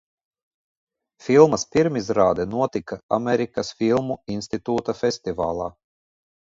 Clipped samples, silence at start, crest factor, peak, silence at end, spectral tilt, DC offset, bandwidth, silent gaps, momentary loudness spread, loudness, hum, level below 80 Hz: under 0.1%; 1.25 s; 22 dB; -2 dBFS; 0.8 s; -5.5 dB/octave; under 0.1%; 7.8 kHz; 3.03-3.09 s; 13 LU; -22 LUFS; none; -54 dBFS